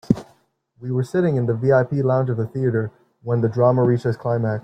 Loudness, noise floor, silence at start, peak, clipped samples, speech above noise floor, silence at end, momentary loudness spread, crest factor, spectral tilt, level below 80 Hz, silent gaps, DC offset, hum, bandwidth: -20 LUFS; -59 dBFS; 0.1 s; -2 dBFS; under 0.1%; 40 dB; 0.05 s; 8 LU; 18 dB; -9.5 dB/octave; -56 dBFS; none; under 0.1%; none; 8.8 kHz